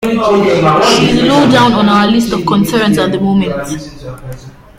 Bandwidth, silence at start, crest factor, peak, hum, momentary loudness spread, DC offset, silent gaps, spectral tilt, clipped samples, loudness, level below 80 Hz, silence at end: 16 kHz; 0 s; 10 dB; 0 dBFS; none; 18 LU; under 0.1%; none; -5.5 dB/octave; under 0.1%; -10 LUFS; -36 dBFS; 0.3 s